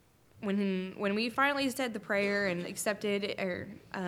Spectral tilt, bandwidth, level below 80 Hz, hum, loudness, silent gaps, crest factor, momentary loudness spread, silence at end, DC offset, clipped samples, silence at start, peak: -4.5 dB/octave; 16.5 kHz; -70 dBFS; none; -32 LUFS; none; 20 dB; 8 LU; 0 s; under 0.1%; under 0.1%; 0.35 s; -14 dBFS